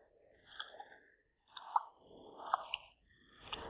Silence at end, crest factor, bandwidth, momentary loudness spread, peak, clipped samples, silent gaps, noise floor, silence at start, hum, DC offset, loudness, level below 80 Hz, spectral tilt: 0 s; 32 dB; 4 kHz; 20 LU; -14 dBFS; under 0.1%; none; -72 dBFS; 0 s; none; under 0.1%; -43 LUFS; -72 dBFS; 1 dB/octave